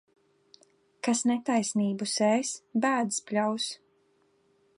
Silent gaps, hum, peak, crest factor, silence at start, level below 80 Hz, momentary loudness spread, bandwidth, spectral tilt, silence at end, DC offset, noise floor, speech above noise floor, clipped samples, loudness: none; none; -12 dBFS; 18 dB; 1.05 s; -82 dBFS; 7 LU; 11.5 kHz; -3.5 dB/octave; 1 s; under 0.1%; -68 dBFS; 40 dB; under 0.1%; -28 LUFS